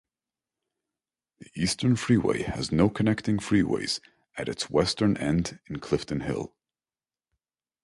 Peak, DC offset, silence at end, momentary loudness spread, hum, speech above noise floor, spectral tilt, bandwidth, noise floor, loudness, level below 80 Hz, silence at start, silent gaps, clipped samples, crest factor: -8 dBFS; under 0.1%; 1.35 s; 11 LU; none; over 64 dB; -5.5 dB/octave; 11.5 kHz; under -90 dBFS; -27 LUFS; -50 dBFS; 1.55 s; none; under 0.1%; 20 dB